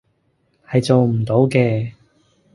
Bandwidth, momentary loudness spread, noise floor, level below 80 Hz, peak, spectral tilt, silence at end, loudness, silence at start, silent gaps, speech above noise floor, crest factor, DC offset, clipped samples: 11.5 kHz; 8 LU; -64 dBFS; -52 dBFS; -2 dBFS; -7.5 dB/octave; 0.65 s; -17 LUFS; 0.7 s; none; 48 dB; 18 dB; under 0.1%; under 0.1%